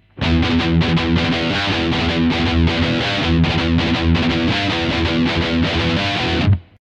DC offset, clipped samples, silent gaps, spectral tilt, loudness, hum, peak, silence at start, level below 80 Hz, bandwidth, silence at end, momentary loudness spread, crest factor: under 0.1%; under 0.1%; none; -6 dB/octave; -17 LUFS; none; -4 dBFS; 0.15 s; -28 dBFS; 8.8 kHz; 0.2 s; 2 LU; 12 dB